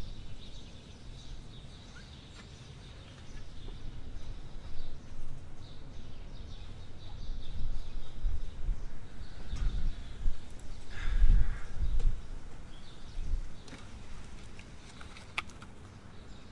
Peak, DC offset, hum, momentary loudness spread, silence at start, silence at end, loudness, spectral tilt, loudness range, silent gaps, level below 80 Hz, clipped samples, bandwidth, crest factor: -12 dBFS; under 0.1%; none; 13 LU; 0 s; 0 s; -43 LUFS; -5.5 dB/octave; 12 LU; none; -36 dBFS; under 0.1%; 7.8 kHz; 20 dB